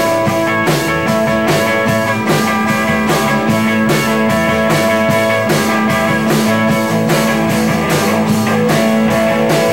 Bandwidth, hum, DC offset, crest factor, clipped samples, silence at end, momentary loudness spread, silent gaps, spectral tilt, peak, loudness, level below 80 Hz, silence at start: 17 kHz; none; 0.7%; 10 dB; under 0.1%; 0 s; 1 LU; none; -5 dB/octave; -2 dBFS; -13 LUFS; -40 dBFS; 0 s